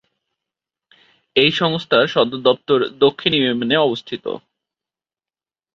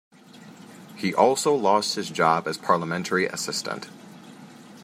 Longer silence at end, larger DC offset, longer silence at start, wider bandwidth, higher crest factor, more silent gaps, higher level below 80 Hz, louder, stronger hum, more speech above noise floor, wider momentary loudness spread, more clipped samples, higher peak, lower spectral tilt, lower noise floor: first, 1.35 s vs 0 s; neither; first, 1.35 s vs 0.35 s; second, 7.4 kHz vs 16 kHz; about the same, 18 dB vs 22 dB; neither; first, -60 dBFS vs -74 dBFS; first, -17 LUFS vs -23 LUFS; neither; first, over 73 dB vs 24 dB; second, 12 LU vs 22 LU; neither; about the same, -2 dBFS vs -4 dBFS; first, -6 dB/octave vs -3.5 dB/octave; first, under -90 dBFS vs -47 dBFS